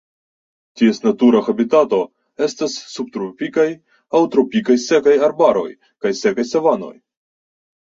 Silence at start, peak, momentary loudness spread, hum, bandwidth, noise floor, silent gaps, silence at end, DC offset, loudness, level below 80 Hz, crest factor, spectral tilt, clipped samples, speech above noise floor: 0.75 s; -2 dBFS; 12 LU; none; 7.8 kHz; under -90 dBFS; none; 0.9 s; under 0.1%; -17 LUFS; -62 dBFS; 16 dB; -5 dB/octave; under 0.1%; over 74 dB